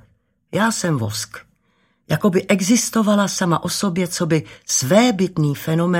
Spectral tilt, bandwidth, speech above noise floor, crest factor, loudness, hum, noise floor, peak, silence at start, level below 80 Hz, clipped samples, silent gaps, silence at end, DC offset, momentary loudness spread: -4.5 dB/octave; 16.5 kHz; 45 dB; 18 dB; -18 LUFS; none; -63 dBFS; 0 dBFS; 0.5 s; -56 dBFS; under 0.1%; none; 0 s; under 0.1%; 8 LU